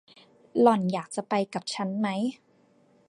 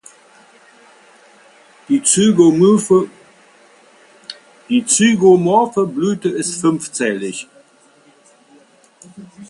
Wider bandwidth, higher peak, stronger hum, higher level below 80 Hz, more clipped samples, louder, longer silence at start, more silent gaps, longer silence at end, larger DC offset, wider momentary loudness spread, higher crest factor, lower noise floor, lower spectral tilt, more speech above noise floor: about the same, 11.5 kHz vs 11.5 kHz; second, -6 dBFS vs 0 dBFS; neither; second, -76 dBFS vs -60 dBFS; neither; second, -27 LUFS vs -14 LUFS; second, 0.55 s vs 1.9 s; neither; first, 0.75 s vs 0.05 s; neither; second, 11 LU vs 18 LU; first, 22 dB vs 16 dB; first, -62 dBFS vs -51 dBFS; first, -6 dB/octave vs -4.5 dB/octave; about the same, 36 dB vs 37 dB